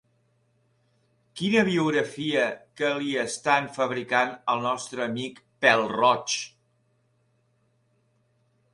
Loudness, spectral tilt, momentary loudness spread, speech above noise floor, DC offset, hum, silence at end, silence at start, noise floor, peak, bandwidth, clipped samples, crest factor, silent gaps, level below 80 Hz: -25 LUFS; -4 dB/octave; 9 LU; 44 dB; under 0.1%; none; 2.25 s; 1.35 s; -69 dBFS; -4 dBFS; 11.5 kHz; under 0.1%; 24 dB; none; -70 dBFS